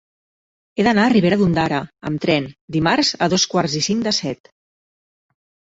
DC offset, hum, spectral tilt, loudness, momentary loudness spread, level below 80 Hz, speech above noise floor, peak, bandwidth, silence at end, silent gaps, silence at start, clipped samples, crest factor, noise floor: under 0.1%; none; -4.5 dB/octave; -18 LUFS; 10 LU; -50 dBFS; over 72 dB; -2 dBFS; 8 kHz; 1.45 s; 2.61-2.68 s; 0.75 s; under 0.1%; 18 dB; under -90 dBFS